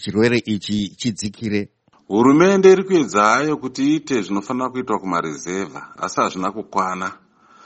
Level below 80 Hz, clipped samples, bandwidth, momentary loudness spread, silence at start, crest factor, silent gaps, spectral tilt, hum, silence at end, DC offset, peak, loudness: -58 dBFS; under 0.1%; 8.4 kHz; 14 LU; 0 s; 18 dB; none; -5.5 dB/octave; none; 0.5 s; under 0.1%; 0 dBFS; -19 LUFS